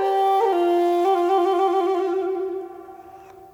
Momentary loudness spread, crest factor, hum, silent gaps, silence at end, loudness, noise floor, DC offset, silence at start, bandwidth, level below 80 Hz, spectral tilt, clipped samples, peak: 11 LU; 12 dB; none; none; 0.1 s; -20 LUFS; -44 dBFS; under 0.1%; 0 s; 16.5 kHz; -68 dBFS; -4.5 dB/octave; under 0.1%; -10 dBFS